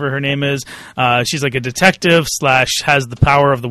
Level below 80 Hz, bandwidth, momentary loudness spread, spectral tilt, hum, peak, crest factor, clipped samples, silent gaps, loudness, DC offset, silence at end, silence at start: -36 dBFS; 13.5 kHz; 7 LU; -4 dB/octave; none; 0 dBFS; 14 dB; under 0.1%; none; -14 LUFS; under 0.1%; 0 s; 0 s